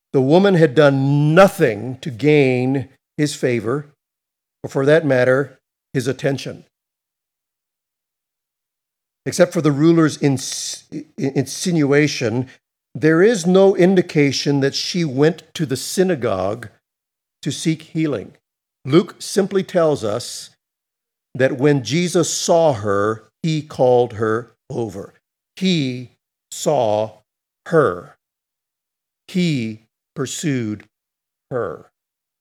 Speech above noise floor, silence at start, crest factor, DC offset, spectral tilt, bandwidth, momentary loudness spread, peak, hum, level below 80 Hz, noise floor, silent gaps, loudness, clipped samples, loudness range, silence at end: 66 dB; 0.15 s; 18 dB; under 0.1%; -5.5 dB/octave; 16.5 kHz; 15 LU; 0 dBFS; none; -64 dBFS; -83 dBFS; none; -18 LUFS; under 0.1%; 9 LU; 0.65 s